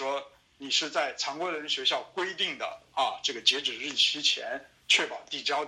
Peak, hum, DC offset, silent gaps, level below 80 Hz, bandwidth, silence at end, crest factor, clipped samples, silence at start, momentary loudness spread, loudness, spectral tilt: -8 dBFS; none; under 0.1%; none; -74 dBFS; 15 kHz; 0 s; 22 dB; under 0.1%; 0 s; 10 LU; -28 LUFS; 0 dB/octave